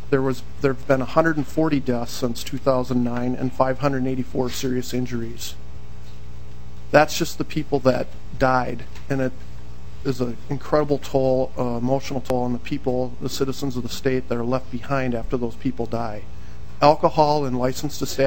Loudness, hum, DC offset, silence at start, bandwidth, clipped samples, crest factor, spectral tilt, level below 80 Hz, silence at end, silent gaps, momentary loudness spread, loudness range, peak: -23 LUFS; 60 Hz at -40 dBFS; 5%; 0 s; 16.5 kHz; under 0.1%; 22 dB; -6 dB/octave; -40 dBFS; 0 s; none; 19 LU; 3 LU; 0 dBFS